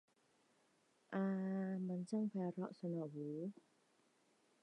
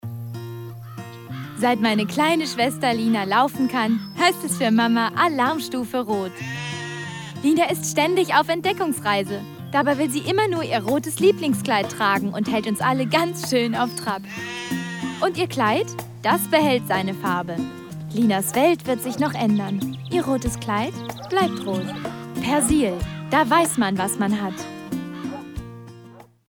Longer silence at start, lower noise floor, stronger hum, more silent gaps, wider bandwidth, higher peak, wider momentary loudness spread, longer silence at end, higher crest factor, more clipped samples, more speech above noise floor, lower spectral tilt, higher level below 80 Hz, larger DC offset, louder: first, 1.1 s vs 0.05 s; first, -77 dBFS vs -46 dBFS; neither; neither; second, 9.6 kHz vs over 20 kHz; second, -30 dBFS vs -6 dBFS; second, 6 LU vs 13 LU; first, 1.1 s vs 0.25 s; about the same, 16 dB vs 16 dB; neither; first, 34 dB vs 24 dB; first, -8.5 dB/octave vs -4.5 dB/octave; second, under -90 dBFS vs -48 dBFS; neither; second, -44 LUFS vs -22 LUFS